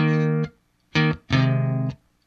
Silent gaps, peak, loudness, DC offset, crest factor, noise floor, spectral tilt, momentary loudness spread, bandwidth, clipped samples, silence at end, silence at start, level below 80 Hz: none; -6 dBFS; -23 LUFS; under 0.1%; 16 dB; -46 dBFS; -7.5 dB/octave; 8 LU; 6.8 kHz; under 0.1%; 0.3 s; 0 s; -50 dBFS